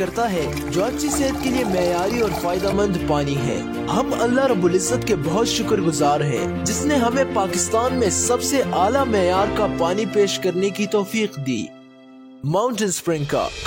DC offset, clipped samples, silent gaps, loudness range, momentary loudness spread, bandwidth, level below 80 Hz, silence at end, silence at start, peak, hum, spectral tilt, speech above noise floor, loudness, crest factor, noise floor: under 0.1%; under 0.1%; none; 3 LU; 5 LU; 16.5 kHz; -42 dBFS; 0 s; 0 s; -6 dBFS; none; -4.5 dB/octave; 24 dB; -20 LUFS; 14 dB; -44 dBFS